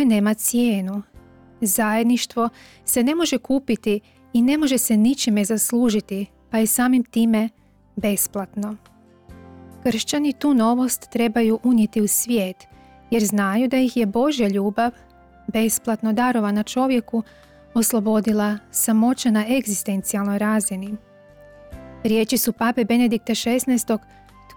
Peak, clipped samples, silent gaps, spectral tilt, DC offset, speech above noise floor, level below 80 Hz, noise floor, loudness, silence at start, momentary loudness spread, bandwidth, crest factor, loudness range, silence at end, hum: -12 dBFS; under 0.1%; none; -4 dB/octave; under 0.1%; 27 dB; -54 dBFS; -47 dBFS; -20 LUFS; 0 s; 9 LU; 20 kHz; 10 dB; 3 LU; 0.05 s; none